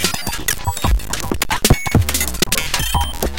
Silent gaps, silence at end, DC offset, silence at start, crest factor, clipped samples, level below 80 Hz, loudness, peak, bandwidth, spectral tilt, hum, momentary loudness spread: none; 0 s; 5%; 0 s; 18 dB; under 0.1%; -24 dBFS; -18 LUFS; 0 dBFS; 17.5 kHz; -3 dB/octave; none; 5 LU